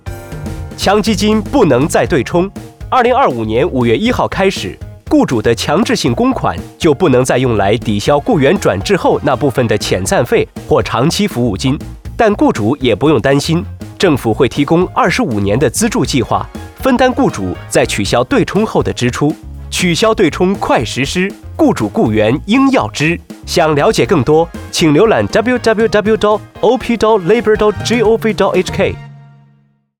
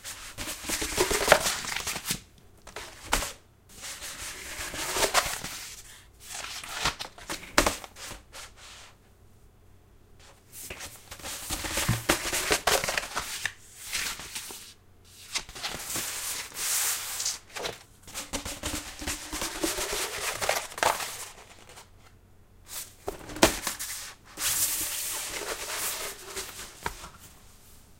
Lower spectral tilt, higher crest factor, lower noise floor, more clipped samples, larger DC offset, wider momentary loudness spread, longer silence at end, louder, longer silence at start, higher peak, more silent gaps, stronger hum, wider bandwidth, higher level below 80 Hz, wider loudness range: first, -5.5 dB/octave vs -1.5 dB/octave; second, 12 dB vs 32 dB; second, -52 dBFS vs -56 dBFS; neither; neither; second, 6 LU vs 19 LU; first, 0.8 s vs 0.05 s; first, -12 LUFS vs -30 LUFS; about the same, 0.05 s vs 0 s; about the same, -2 dBFS vs 0 dBFS; neither; neither; first, 19.5 kHz vs 16.5 kHz; first, -34 dBFS vs -48 dBFS; second, 2 LU vs 6 LU